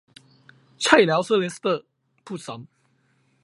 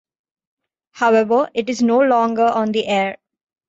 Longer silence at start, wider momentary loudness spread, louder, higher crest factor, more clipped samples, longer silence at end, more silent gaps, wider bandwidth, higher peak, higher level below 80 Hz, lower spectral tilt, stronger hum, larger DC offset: second, 0.8 s vs 0.95 s; first, 21 LU vs 6 LU; second, -20 LUFS vs -17 LUFS; first, 24 dB vs 14 dB; neither; first, 0.8 s vs 0.55 s; neither; first, 11.5 kHz vs 8 kHz; first, 0 dBFS vs -4 dBFS; about the same, -68 dBFS vs -64 dBFS; about the same, -4 dB/octave vs -5 dB/octave; neither; neither